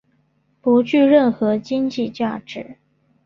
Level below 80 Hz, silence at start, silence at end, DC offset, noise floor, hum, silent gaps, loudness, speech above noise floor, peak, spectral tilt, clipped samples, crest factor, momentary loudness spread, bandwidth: -62 dBFS; 0.65 s; 0.5 s; under 0.1%; -63 dBFS; none; none; -18 LUFS; 45 dB; -2 dBFS; -7 dB/octave; under 0.1%; 16 dB; 19 LU; 7.2 kHz